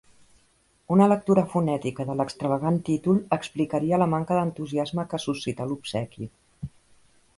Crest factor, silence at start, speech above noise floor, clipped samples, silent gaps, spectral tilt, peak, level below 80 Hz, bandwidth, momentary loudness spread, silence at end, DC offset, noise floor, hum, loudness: 20 dB; 0.9 s; 40 dB; under 0.1%; none; -7.5 dB/octave; -6 dBFS; -58 dBFS; 11.5 kHz; 16 LU; 0.7 s; under 0.1%; -64 dBFS; none; -25 LUFS